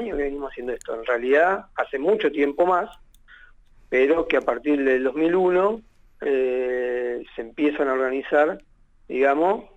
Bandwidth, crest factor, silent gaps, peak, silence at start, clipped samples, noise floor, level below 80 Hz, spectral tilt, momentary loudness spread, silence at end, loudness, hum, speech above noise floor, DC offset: 8 kHz; 16 dB; none; -6 dBFS; 0 s; under 0.1%; -51 dBFS; -50 dBFS; -6 dB/octave; 12 LU; 0.1 s; -22 LUFS; none; 29 dB; under 0.1%